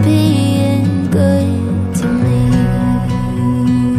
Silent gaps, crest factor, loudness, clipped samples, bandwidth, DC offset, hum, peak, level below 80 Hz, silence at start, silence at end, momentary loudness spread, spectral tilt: none; 12 dB; -14 LUFS; under 0.1%; 14.5 kHz; under 0.1%; none; -2 dBFS; -30 dBFS; 0 s; 0 s; 4 LU; -7.5 dB/octave